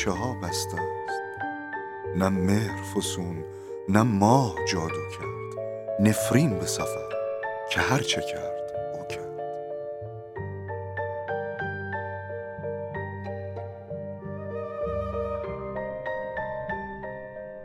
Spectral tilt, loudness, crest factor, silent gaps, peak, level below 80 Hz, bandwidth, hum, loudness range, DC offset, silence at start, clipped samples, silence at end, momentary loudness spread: -5 dB/octave; -29 LUFS; 26 dB; none; -4 dBFS; -52 dBFS; 16 kHz; none; 9 LU; under 0.1%; 0 s; under 0.1%; 0 s; 14 LU